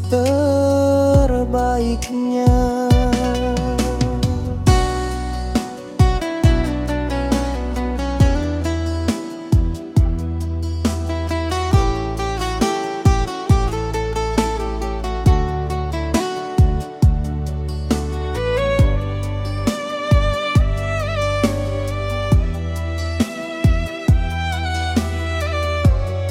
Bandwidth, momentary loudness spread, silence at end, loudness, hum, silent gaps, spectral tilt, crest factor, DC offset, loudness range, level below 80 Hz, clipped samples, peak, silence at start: 15.5 kHz; 8 LU; 0 s; -19 LUFS; none; none; -6.5 dB/octave; 16 dB; under 0.1%; 3 LU; -24 dBFS; under 0.1%; -2 dBFS; 0 s